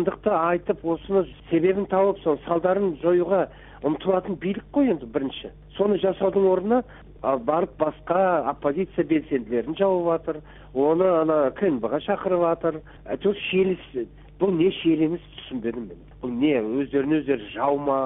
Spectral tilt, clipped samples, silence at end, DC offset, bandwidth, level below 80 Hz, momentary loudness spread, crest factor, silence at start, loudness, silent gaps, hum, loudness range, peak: -11 dB/octave; under 0.1%; 0 s; under 0.1%; 3.9 kHz; -52 dBFS; 11 LU; 16 dB; 0 s; -24 LUFS; none; none; 2 LU; -8 dBFS